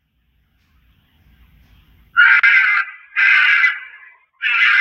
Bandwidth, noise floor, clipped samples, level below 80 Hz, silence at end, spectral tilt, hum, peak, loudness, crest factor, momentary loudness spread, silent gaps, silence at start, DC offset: 8.6 kHz; -62 dBFS; under 0.1%; -58 dBFS; 0 s; 1 dB/octave; none; 0 dBFS; -12 LUFS; 16 dB; 12 LU; none; 2.15 s; under 0.1%